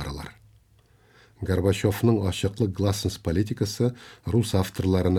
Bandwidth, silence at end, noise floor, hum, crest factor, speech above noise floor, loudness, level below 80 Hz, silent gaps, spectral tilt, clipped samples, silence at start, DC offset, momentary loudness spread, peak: 16.5 kHz; 0 s; -59 dBFS; none; 16 dB; 35 dB; -25 LUFS; -46 dBFS; none; -6.5 dB/octave; under 0.1%; 0 s; under 0.1%; 13 LU; -8 dBFS